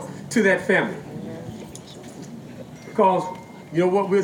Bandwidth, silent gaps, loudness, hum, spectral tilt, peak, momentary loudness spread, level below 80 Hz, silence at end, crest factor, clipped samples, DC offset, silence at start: 16.5 kHz; none; -21 LUFS; none; -5.5 dB/octave; -6 dBFS; 19 LU; -62 dBFS; 0 s; 16 dB; under 0.1%; under 0.1%; 0 s